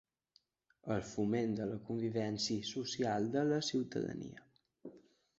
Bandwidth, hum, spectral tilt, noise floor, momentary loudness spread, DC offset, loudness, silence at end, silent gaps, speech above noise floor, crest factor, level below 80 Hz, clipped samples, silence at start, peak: 8 kHz; none; -5 dB/octave; -75 dBFS; 17 LU; under 0.1%; -37 LUFS; 0.4 s; none; 38 dB; 16 dB; -70 dBFS; under 0.1%; 0.85 s; -22 dBFS